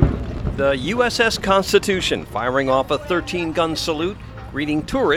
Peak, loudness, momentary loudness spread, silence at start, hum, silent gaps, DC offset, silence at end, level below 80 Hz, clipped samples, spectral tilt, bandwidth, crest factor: 0 dBFS; -20 LUFS; 10 LU; 0 s; none; none; under 0.1%; 0 s; -32 dBFS; under 0.1%; -5 dB/octave; 17 kHz; 20 dB